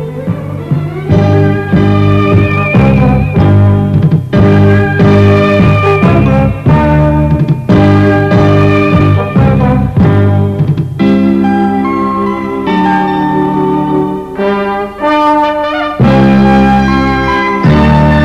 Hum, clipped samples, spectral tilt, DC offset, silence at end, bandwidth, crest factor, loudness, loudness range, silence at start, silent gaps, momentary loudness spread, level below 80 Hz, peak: 50 Hz at -20 dBFS; 0.3%; -9 dB/octave; under 0.1%; 0 s; 7.4 kHz; 8 dB; -9 LUFS; 4 LU; 0 s; none; 7 LU; -24 dBFS; 0 dBFS